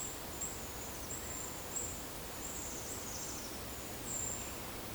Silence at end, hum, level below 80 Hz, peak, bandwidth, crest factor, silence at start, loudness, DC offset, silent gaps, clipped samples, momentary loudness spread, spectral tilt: 0 s; none; -56 dBFS; -28 dBFS; over 20 kHz; 16 dB; 0 s; -41 LUFS; under 0.1%; none; under 0.1%; 4 LU; -2.5 dB/octave